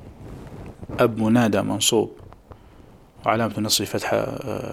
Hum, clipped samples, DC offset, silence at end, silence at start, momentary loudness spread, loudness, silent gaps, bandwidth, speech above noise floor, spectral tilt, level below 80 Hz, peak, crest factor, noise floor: none; under 0.1%; under 0.1%; 0 s; 0 s; 20 LU; -22 LUFS; none; 16.5 kHz; 27 dB; -4 dB/octave; -50 dBFS; -4 dBFS; 20 dB; -48 dBFS